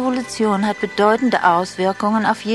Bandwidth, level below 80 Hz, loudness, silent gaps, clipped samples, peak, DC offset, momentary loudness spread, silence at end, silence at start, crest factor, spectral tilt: 12 kHz; -56 dBFS; -18 LUFS; none; under 0.1%; -2 dBFS; under 0.1%; 6 LU; 0 s; 0 s; 16 dB; -5 dB/octave